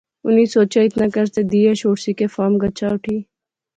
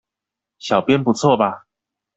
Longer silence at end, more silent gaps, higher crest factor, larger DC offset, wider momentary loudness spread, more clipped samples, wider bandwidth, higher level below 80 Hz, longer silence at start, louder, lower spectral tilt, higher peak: about the same, 0.55 s vs 0.6 s; neither; about the same, 14 dB vs 18 dB; neither; second, 7 LU vs 15 LU; neither; about the same, 9 kHz vs 8.2 kHz; first, -52 dBFS vs -58 dBFS; second, 0.25 s vs 0.65 s; about the same, -17 LUFS vs -17 LUFS; about the same, -6.5 dB/octave vs -6 dB/octave; about the same, -4 dBFS vs -2 dBFS